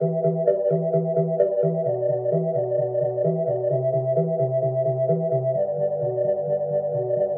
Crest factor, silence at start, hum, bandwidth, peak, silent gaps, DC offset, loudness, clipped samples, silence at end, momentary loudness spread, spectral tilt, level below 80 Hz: 14 dB; 0 s; none; 2.1 kHz; -8 dBFS; none; under 0.1%; -23 LUFS; under 0.1%; 0 s; 3 LU; -14 dB/octave; -70 dBFS